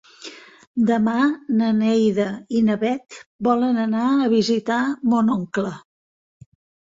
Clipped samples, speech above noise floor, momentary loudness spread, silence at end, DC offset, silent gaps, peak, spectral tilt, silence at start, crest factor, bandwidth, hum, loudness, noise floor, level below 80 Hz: under 0.1%; 22 dB; 11 LU; 1.05 s; under 0.1%; 0.67-0.74 s, 3.26-3.39 s; -6 dBFS; -6.5 dB/octave; 0.2 s; 16 dB; 7.8 kHz; none; -20 LUFS; -41 dBFS; -62 dBFS